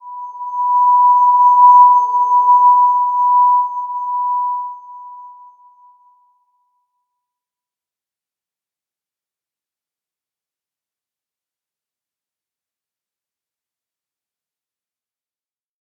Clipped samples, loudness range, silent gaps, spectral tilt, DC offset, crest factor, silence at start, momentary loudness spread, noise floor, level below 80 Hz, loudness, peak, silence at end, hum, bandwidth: under 0.1%; 15 LU; none; -2.5 dB/octave; under 0.1%; 16 dB; 0.05 s; 16 LU; under -90 dBFS; under -90 dBFS; -11 LUFS; -2 dBFS; 10.7 s; none; 6.6 kHz